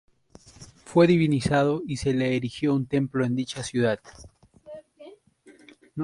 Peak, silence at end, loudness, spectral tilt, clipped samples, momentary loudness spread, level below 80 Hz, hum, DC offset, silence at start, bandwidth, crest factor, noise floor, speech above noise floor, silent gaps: -6 dBFS; 0 s; -24 LUFS; -6.5 dB/octave; under 0.1%; 22 LU; -54 dBFS; none; under 0.1%; 0.6 s; 11.5 kHz; 20 dB; -55 dBFS; 31 dB; none